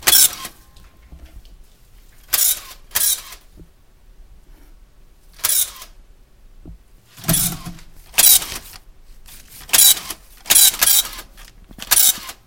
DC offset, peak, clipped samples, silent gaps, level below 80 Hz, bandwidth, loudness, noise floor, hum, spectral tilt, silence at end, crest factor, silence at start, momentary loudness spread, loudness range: 0.1%; 0 dBFS; under 0.1%; none; -42 dBFS; over 20 kHz; -13 LUFS; -48 dBFS; none; 0.5 dB/octave; 0.15 s; 20 dB; 0 s; 22 LU; 11 LU